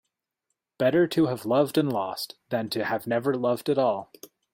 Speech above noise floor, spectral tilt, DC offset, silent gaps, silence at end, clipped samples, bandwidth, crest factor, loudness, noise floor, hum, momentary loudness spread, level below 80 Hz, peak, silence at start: 57 dB; -6 dB/octave; under 0.1%; none; 0.25 s; under 0.1%; 16.5 kHz; 16 dB; -26 LUFS; -82 dBFS; none; 8 LU; -68 dBFS; -10 dBFS; 0.8 s